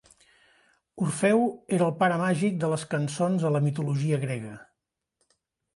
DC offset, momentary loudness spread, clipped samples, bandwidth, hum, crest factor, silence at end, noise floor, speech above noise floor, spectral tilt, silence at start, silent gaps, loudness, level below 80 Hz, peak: under 0.1%; 8 LU; under 0.1%; 11.5 kHz; none; 18 dB; 1.15 s; -82 dBFS; 57 dB; -6.5 dB/octave; 0.95 s; none; -26 LUFS; -68 dBFS; -10 dBFS